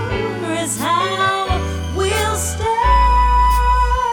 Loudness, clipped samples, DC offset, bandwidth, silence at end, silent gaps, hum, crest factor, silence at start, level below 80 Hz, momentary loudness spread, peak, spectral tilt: -17 LUFS; under 0.1%; under 0.1%; 18.5 kHz; 0 s; none; none; 14 dB; 0 s; -22 dBFS; 8 LU; -2 dBFS; -4 dB/octave